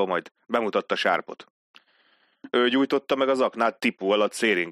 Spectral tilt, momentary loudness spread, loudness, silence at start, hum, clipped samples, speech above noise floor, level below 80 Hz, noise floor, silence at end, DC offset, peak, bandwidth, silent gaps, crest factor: -4 dB/octave; 6 LU; -24 LUFS; 0 s; none; under 0.1%; 40 dB; -74 dBFS; -64 dBFS; 0 s; under 0.1%; -8 dBFS; 14 kHz; 0.31-0.35 s, 1.50-1.74 s; 18 dB